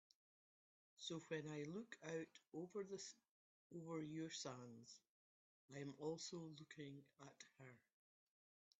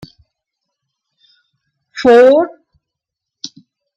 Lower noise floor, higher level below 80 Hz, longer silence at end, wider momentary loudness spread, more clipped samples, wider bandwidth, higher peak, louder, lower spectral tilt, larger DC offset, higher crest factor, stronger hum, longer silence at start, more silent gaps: first, under -90 dBFS vs -81 dBFS; second, under -90 dBFS vs -58 dBFS; first, 1 s vs 0.5 s; second, 13 LU vs 24 LU; neither; about the same, 8 kHz vs 8 kHz; second, -34 dBFS vs -2 dBFS; second, -54 LUFS vs -10 LUFS; about the same, -4.5 dB/octave vs -4.5 dB/octave; neither; first, 20 dB vs 14 dB; neither; second, 1 s vs 1.95 s; first, 3.29-3.70 s, 5.09-5.69 s vs none